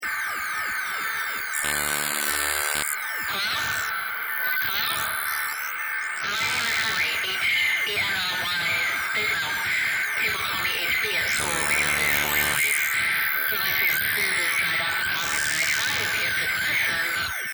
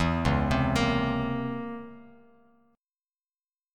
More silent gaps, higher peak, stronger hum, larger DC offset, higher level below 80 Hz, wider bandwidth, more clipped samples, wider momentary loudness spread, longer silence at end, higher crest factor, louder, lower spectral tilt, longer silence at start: neither; first, 0 dBFS vs -10 dBFS; neither; neither; second, -54 dBFS vs -40 dBFS; first, over 20 kHz vs 14 kHz; neither; second, 6 LU vs 14 LU; second, 0 s vs 1.7 s; about the same, 24 dB vs 20 dB; first, -23 LUFS vs -27 LUFS; second, 0 dB/octave vs -6.5 dB/octave; about the same, 0 s vs 0 s